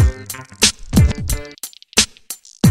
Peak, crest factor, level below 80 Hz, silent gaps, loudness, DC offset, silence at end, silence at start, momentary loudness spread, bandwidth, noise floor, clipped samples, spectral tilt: 0 dBFS; 18 dB; -24 dBFS; none; -17 LUFS; under 0.1%; 0 s; 0 s; 17 LU; 16.5 kHz; -36 dBFS; under 0.1%; -3.5 dB/octave